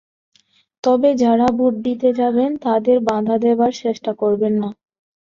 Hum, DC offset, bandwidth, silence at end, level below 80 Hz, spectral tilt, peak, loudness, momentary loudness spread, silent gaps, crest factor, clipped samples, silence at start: none; under 0.1%; 7.4 kHz; 0.5 s; -58 dBFS; -7 dB/octave; -4 dBFS; -17 LUFS; 7 LU; none; 14 dB; under 0.1%; 0.85 s